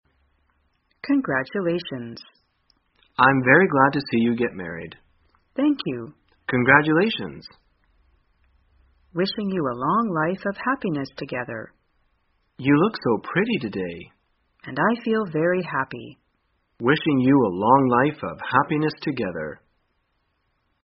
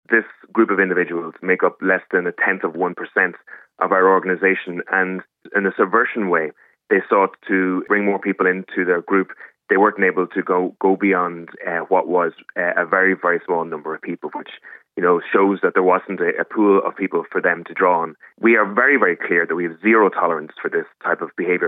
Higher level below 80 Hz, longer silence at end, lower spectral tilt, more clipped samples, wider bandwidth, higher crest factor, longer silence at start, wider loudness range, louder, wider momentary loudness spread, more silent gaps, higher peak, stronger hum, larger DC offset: first, -60 dBFS vs -84 dBFS; first, 1.3 s vs 0 s; second, -4.5 dB/octave vs -10 dB/octave; neither; first, 5.8 kHz vs 3.9 kHz; first, 24 dB vs 18 dB; first, 1.05 s vs 0.1 s; about the same, 5 LU vs 3 LU; second, -22 LUFS vs -18 LUFS; first, 18 LU vs 9 LU; neither; about the same, 0 dBFS vs 0 dBFS; neither; neither